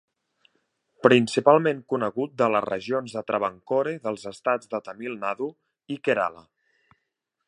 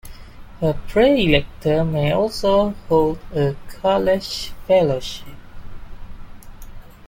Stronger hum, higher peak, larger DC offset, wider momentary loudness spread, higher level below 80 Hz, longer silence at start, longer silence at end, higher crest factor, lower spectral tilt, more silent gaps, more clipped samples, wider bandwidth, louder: neither; about the same, -2 dBFS vs -2 dBFS; neither; first, 13 LU vs 9 LU; second, -72 dBFS vs -36 dBFS; first, 1.05 s vs 0.05 s; first, 1.05 s vs 0 s; first, 24 dB vs 18 dB; about the same, -5.5 dB/octave vs -6 dB/octave; neither; neither; second, 11.5 kHz vs 17 kHz; second, -25 LUFS vs -19 LUFS